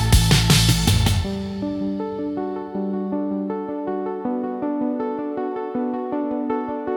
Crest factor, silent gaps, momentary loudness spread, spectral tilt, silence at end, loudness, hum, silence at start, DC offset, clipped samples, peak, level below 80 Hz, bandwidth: 20 dB; none; 11 LU; -5 dB/octave; 0 s; -22 LUFS; none; 0 s; under 0.1%; under 0.1%; -2 dBFS; -30 dBFS; 18 kHz